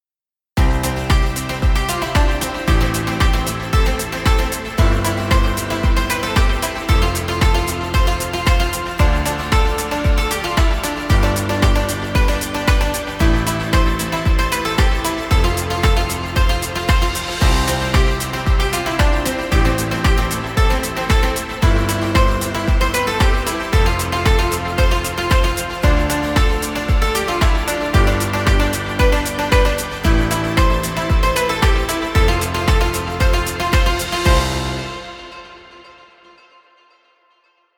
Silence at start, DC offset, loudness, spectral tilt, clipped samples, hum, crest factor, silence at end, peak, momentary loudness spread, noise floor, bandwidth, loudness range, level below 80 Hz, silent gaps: 0.55 s; under 0.1%; -18 LUFS; -4.5 dB/octave; under 0.1%; none; 16 dB; 2 s; 0 dBFS; 3 LU; under -90 dBFS; 19 kHz; 1 LU; -18 dBFS; none